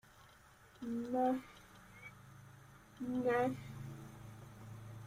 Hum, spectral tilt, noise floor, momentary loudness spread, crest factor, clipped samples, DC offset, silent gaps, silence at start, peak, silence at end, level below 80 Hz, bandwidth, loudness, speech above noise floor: none; -7 dB/octave; -63 dBFS; 24 LU; 20 dB; under 0.1%; under 0.1%; none; 0.05 s; -22 dBFS; 0 s; -70 dBFS; 16 kHz; -39 LUFS; 26 dB